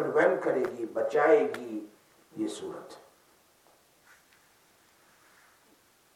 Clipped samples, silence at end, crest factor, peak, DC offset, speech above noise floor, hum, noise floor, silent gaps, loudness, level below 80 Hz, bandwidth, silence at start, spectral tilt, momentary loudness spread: under 0.1%; 3.2 s; 22 dB; -10 dBFS; under 0.1%; 36 dB; none; -64 dBFS; none; -28 LUFS; -82 dBFS; 15 kHz; 0 s; -5 dB/octave; 23 LU